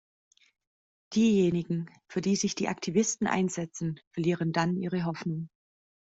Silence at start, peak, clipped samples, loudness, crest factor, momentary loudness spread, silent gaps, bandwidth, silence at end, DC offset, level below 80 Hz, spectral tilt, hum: 1.1 s; -12 dBFS; under 0.1%; -29 LUFS; 18 dB; 10 LU; 4.07-4.11 s; 8 kHz; 0.65 s; under 0.1%; -66 dBFS; -5.5 dB/octave; none